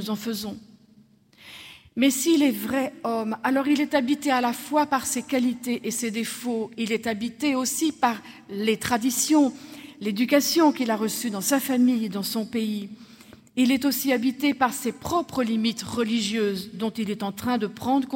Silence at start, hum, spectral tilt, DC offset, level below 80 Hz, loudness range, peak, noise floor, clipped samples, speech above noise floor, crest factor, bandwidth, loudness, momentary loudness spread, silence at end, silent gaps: 0 s; none; -3.5 dB/octave; under 0.1%; -66 dBFS; 3 LU; -6 dBFS; -56 dBFS; under 0.1%; 32 dB; 18 dB; 16.5 kHz; -24 LUFS; 10 LU; 0 s; none